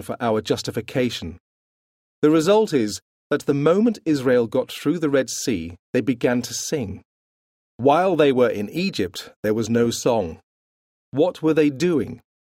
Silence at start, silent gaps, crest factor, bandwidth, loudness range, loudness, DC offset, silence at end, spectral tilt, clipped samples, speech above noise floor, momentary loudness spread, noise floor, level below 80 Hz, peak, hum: 0 s; 1.40-2.22 s, 3.02-3.30 s, 5.79-5.93 s, 7.05-7.79 s, 9.36-9.43 s, 10.43-11.12 s; 18 dB; 16 kHz; 3 LU; -21 LUFS; under 0.1%; 0.4 s; -5.5 dB/octave; under 0.1%; over 70 dB; 10 LU; under -90 dBFS; -56 dBFS; -4 dBFS; none